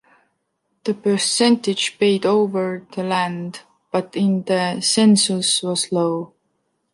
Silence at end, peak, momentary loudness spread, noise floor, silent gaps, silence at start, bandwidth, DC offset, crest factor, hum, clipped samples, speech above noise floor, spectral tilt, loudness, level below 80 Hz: 0.65 s; -4 dBFS; 12 LU; -72 dBFS; none; 0.85 s; 11.5 kHz; under 0.1%; 16 dB; none; under 0.1%; 53 dB; -4 dB/octave; -19 LUFS; -68 dBFS